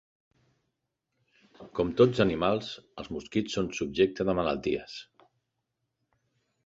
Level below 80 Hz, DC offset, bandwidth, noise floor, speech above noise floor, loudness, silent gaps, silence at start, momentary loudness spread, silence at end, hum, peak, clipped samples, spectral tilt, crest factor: -56 dBFS; under 0.1%; 7.8 kHz; -82 dBFS; 54 dB; -28 LUFS; none; 1.6 s; 16 LU; 1.6 s; none; -8 dBFS; under 0.1%; -6 dB/octave; 22 dB